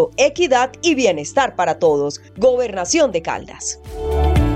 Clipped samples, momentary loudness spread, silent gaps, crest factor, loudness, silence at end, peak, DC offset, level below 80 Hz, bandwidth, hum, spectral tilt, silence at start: under 0.1%; 10 LU; none; 14 dB; -18 LUFS; 0 s; -4 dBFS; under 0.1%; -28 dBFS; 13 kHz; none; -4.5 dB/octave; 0 s